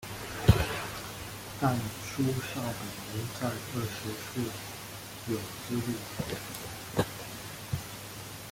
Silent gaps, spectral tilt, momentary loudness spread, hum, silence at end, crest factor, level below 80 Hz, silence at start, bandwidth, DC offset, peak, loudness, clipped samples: none; -5 dB/octave; 12 LU; none; 0 s; 28 dB; -48 dBFS; 0 s; 17 kHz; under 0.1%; -6 dBFS; -34 LUFS; under 0.1%